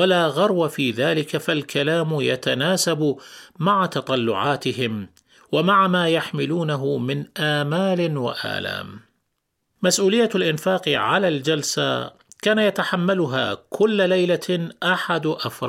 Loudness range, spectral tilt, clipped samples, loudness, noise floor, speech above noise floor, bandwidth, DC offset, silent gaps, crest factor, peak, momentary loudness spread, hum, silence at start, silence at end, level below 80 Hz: 2 LU; -4.5 dB/octave; under 0.1%; -21 LUFS; -75 dBFS; 54 dB; 16.5 kHz; under 0.1%; none; 16 dB; -6 dBFS; 8 LU; none; 0 s; 0 s; -66 dBFS